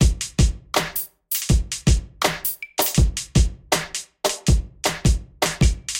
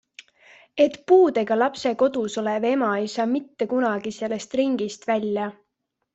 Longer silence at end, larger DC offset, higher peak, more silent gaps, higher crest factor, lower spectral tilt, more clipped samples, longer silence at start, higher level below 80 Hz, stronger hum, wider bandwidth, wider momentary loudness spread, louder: second, 0 s vs 0.6 s; neither; about the same, -4 dBFS vs -6 dBFS; neither; about the same, 16 dB vs 18 dB; about the same, -4 dB/octave vs -5 dB/octave; neither; second, 0 s vs 0.75 s; first, -24 dBFS vs -68 dBFS; neither; first, 17 kHz vs 8.2 kHz; second, 5 LU vs 11 LU; about the same, -22 LUFS vs -23 LUFS